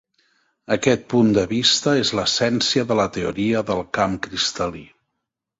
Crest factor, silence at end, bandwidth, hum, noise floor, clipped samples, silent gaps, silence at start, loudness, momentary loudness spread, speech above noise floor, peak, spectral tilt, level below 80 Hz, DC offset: 20 dB; 0.75 s; 8 kHz; none; -80 dBFS; under 0.1%; none; 0.7 s; -20 LUFS; 7 LU; 60 dB; -2 dBFS; -4 dB/octave; -50 dBFS; under 0.1%